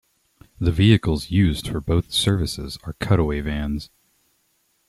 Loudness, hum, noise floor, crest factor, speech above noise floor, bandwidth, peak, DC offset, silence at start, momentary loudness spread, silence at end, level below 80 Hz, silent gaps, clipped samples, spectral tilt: -21 LUFS; none; -67 dBFS; 18 dB; 46 dB; 13 kHz; -4 dBFS; under 0.1%; 0.6 s; 14 LU; 1.05 s; -36 dBFS; none; under 0.1%; -6 dB/octave